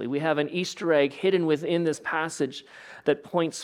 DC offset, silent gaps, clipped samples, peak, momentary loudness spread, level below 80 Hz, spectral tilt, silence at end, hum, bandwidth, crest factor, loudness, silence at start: under 0.1%; none; under 0.1%; -8 dBFS; 8 LU; -74 dBFS; -5 dB/octave; 0 s; none; 14 kHz; 18 dB; -26 LUFS; 0 s